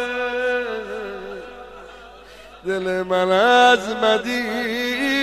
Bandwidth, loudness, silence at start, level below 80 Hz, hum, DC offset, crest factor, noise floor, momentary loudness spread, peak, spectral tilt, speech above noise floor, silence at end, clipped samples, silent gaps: 15 kHz; -19 LUFS; 0 s; -54 dBFS; none; under 0.1%; 18 dB; -42 dBFS; 23 LU; -2 dBFS; -3.5 dB/octave; 25 dB; 0 s; under 0.1%; none